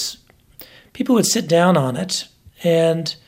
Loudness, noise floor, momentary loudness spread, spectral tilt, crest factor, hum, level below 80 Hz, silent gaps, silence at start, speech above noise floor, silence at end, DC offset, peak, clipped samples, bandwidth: -18 LUFS; -45 dBFS; 11 LU; -4.5 dB/octave; 16 dB; none; -58 dBFS; none; 0 s; 28 dB; 0.15 s; under 0.1%; -2 dBFS; under 0.1%; 16.5 kHz